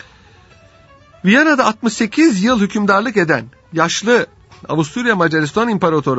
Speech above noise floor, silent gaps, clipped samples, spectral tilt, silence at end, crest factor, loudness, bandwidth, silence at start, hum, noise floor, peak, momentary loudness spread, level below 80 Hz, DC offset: 31 dB; none; under 0.1%; -5 dB/octave; 0 s; 16 dB; -15 LUFS; 8 kHz; 1.25 s; none; -46 dBFS; 0 dBFS; 8 LU; -52 dBFS; under 0.1%